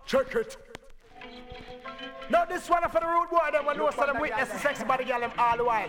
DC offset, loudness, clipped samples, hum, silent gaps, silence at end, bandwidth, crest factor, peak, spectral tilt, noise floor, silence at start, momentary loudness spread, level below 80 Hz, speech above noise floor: under 0.1%; -27 LUFS; under 0.1%; none; none; 0 s; 18.5 kHz; 18 dB; -10 dBFS; -4 dB/octave; -48 dBFS; 0.05 s; 19 LU; -52 dBFS; 21 dB